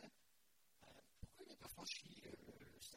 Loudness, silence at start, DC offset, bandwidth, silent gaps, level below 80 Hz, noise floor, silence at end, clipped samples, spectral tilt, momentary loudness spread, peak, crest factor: -56 LUFS; 0 s; under 0.1%; 16 kHz; none; -74 dBFS; -80 dBFS; 0 s; under 0.1%; -2.5 dB/octave; 17 LU; -36 dBFS; 24 dB